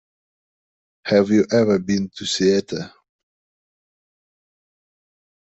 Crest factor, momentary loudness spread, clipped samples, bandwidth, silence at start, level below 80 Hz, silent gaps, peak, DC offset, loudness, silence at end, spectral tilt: 20 dB; 14 LU; under 0.1%; 8.2 kHz; 1.05 s; -62 dBFS; none; -4 dBFS; under 0.1%; -19 LUFS; 2.65 s; -5 dB/octave